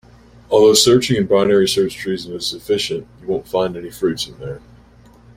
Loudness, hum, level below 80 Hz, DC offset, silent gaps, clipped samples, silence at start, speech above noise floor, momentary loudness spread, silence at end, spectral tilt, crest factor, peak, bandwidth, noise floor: -17 LUFS; none; -48 dBFS; under 0.1%; none; under 0.1%; 0.5 s; 30 dB; 14 LU; 0.8 s; -4 dB/octave; 18 dB; 0 dBFS; 16.5 kHz; -46 dBFS